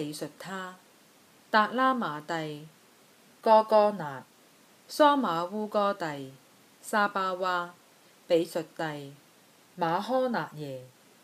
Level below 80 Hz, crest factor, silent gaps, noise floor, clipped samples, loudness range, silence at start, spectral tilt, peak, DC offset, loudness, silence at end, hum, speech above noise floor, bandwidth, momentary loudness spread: -82 dBFS; 22 dB; none; -59 dBFS; under 0.1%; 5 LU; 0 s; -5 dB/octave; -8 dBFS; under 0.1%; -28 LUFS; 0.35 s; none; 31 dB; 15 kHz; 19 LU